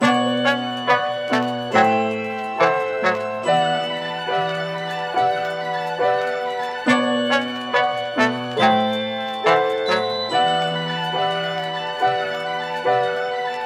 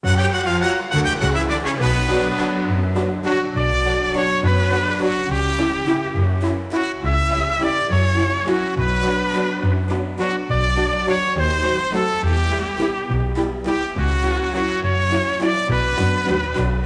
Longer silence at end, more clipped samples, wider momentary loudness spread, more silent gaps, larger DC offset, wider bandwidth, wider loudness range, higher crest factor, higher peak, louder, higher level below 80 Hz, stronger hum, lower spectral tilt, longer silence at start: about the same, 0 s vs 0 s; neither; first, 7 LU vs 4 LU; neither; neither; first, 14 kHz vs 10.5 kHz; about the same, 2 LU vs 1 LU; first, 20 dB vs 12 dB; first, -2 dBFS vs -6 dBFS; about the same, -20 LUFS vs -20 LUFS; second, -74 dBFS vs -28 dBFS; neither; second, -4.5 dB/octave vs -6 dB/octave; about the same, 0 s vs 0 s